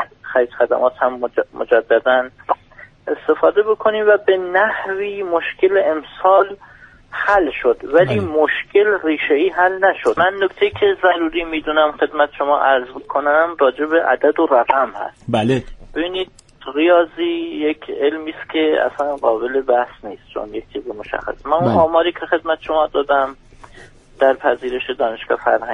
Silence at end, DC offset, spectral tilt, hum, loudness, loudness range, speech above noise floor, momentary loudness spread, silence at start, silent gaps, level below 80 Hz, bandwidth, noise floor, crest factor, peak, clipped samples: 0 s; under 0.1%; -6.5 dB/octave; none; -17 LUFS; 3 LU; 26 dB; 10 LU; 0 s; none; -48 dBFS; 10 kHz; -43 dBFS; 16 dB; 0 dBFS; under 0.1%